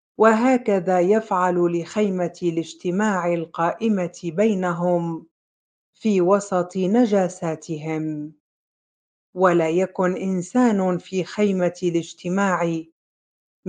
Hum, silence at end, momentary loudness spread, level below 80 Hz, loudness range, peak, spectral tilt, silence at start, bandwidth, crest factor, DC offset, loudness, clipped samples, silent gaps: none; 0 s; 9 LU; -70 dBFS; 2 LU; -2 dBFS; -6.5 dB/octave; 0.2 s; 9.4 kHz; 18 dB; under 0.1%; -21 LUFS; under 0.1%; 5.31-5.93 s, 8.40-9.33 s, 12.92-13.63 s